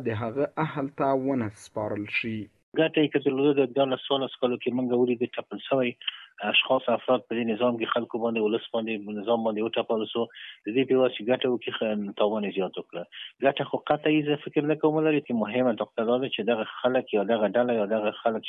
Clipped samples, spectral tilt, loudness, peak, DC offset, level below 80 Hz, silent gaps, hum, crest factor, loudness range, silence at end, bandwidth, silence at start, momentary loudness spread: under 0.1%; -7 dB/octave; -27 LUFS; -10 dBFS; under 0.1%; -70 dBFS; 2.63-2.72 s; none; 18 dB; 2 LU; 0 s; 11.5 kHz; 0 s; 8 LU